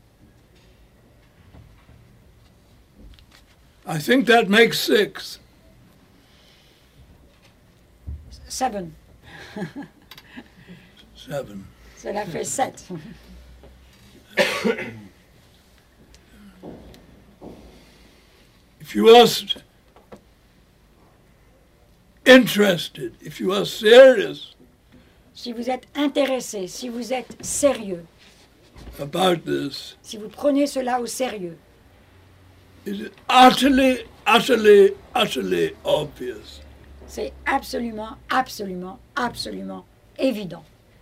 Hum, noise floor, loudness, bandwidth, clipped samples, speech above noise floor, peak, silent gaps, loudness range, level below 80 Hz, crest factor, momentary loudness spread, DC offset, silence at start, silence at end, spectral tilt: none; -55 dBFS; -19 LUFS; 16 kHz; under 0.1%; 36 dB; -2 dBFS; none; 17 LU; -52 dBFS; 20 dB; 25 LU; under 0.1%; 3.85 s; 0.4 s; -4 dB/octave